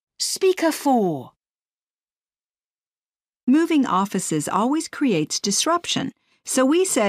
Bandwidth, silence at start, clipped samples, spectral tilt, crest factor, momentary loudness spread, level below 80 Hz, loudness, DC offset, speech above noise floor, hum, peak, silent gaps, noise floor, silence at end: 15.5 kHz; 0.2 s; under 0.1%; -3.5 dB/octave; 16 dB; 7 LU; -70 dBFS; -21 LUFS; under 0.1%; over 70 dB; none; -6 dBFS; 1.51-1.59 s, 1.73-1.94 s, 2.03-2.07 s, 2.17-2.22 s, 2.87-2.91 s, 2.98-3.09 s, 3.29-3.33 s, 3.43-3.47 s; under -90 dBFS; 0 s